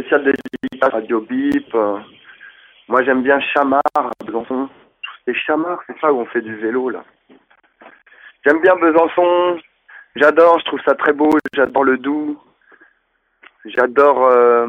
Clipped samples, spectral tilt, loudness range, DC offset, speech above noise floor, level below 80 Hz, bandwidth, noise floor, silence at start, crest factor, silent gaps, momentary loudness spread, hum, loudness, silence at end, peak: under 0.1%; -6 dB/octave; 7 LU; under 0.1%; 50 dB; -62 dBFS; 6.8 kHz; -65 dBFS; 0 s; 16 dB; none; 13 LU; none; -16 LUFS; 0 s; 0 dBFS